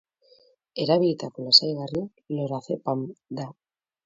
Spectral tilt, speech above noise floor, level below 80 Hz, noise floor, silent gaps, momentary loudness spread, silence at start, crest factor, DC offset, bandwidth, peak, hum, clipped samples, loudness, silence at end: -5.5 dB/octave; 35 dB; -66 dBFS; -60 dBFS; none; 19 LU; 0.75 s; 24 dB; under 0.1%; 7.8 kHz; -2 dBFS; none; under 0.1%; -23 LUFS; 0.55 s